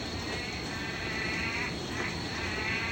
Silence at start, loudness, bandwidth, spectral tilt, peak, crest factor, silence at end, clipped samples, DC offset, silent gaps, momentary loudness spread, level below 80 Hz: 0 s; -33 LUFS; 16 kHz; -4 dB/octave; -20 dBFS; 14 dB; 0 s; under 0.1%; under 0.1%; none; 4 LU; -48 dBFS